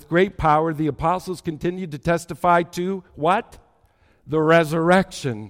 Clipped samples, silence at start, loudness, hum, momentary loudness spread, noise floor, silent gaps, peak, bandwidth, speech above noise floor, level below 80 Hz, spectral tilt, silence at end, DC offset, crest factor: under 0.1%; 0.1 s; -21 LUFS; none; 10 LU; -59 dBFS; none; -4 dBFS; 16.5 kHz; 38 dB; -46 dBFS; -6.5 dB/octave; 0 s; under 0.1%; 18 dB